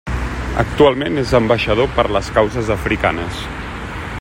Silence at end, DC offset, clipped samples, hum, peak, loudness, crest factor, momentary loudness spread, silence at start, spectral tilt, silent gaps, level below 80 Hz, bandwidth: 0 s; under 0.1%; under 0.1%; none; 0 dBFS; -17 LUFS; 16 dB; 13 LU; 0.05 s; -6 dB/octave; none; -28 dBFS; 16 kHz